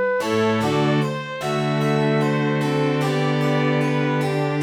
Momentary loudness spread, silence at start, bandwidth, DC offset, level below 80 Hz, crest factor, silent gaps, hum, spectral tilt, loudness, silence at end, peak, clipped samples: 3 LU; 0 s; 14 kHz; under 0.1%; -58 dBFS; 12 dB; none; none; -6.5 dB/octave; -21 LUFS; 0 s; -8 dBFS; under 0.1%